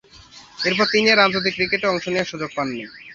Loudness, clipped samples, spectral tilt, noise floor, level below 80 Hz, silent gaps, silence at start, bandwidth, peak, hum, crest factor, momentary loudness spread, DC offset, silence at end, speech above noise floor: -19 LUFS; under 0.1%; -4 dB/octave; -46 dBFS; -56 dBFS; none; 0.15 s; 7.8 kHz; -2 dBFS; none; 20 dB; 12 LU; under 0.1%; 0 s; 25 dB